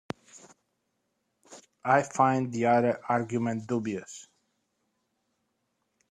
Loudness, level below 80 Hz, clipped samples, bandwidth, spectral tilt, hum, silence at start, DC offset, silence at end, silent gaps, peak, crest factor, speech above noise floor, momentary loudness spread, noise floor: -27 LUFS; -72 dBFS; under 0.1%; 10.5 kHz; -6.5 dB/octave; none; 0.35 s; under 0.1%; 1.9 s; none; -8 dBFS; 22 dB; 52 dB; 18 LU; -78 dBFS